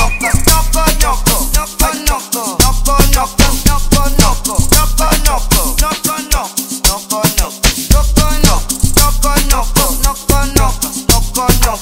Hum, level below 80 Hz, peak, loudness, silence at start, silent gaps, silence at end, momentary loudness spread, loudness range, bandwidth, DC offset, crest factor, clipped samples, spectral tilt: none; -14 dBFS; 0 dBFS; -12 LUFS; 0 s; none; 0 s; 4 LU; 1 LU; 16.5 kHz; under 0.1%; 10 dB; 0.3%; -3 dB/octave